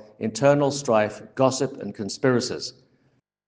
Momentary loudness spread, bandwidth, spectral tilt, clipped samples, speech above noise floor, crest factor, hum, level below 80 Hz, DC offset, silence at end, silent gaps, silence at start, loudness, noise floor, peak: 12 LU; 10 kHz; -5 dB/octave; under 0.1%; 44 dB; 20 dB; none; -66 dBFS; under 0.1%; 0.75 s; none; 0.2 s; -23 LUFS; -67 dBFS; -4 dBFS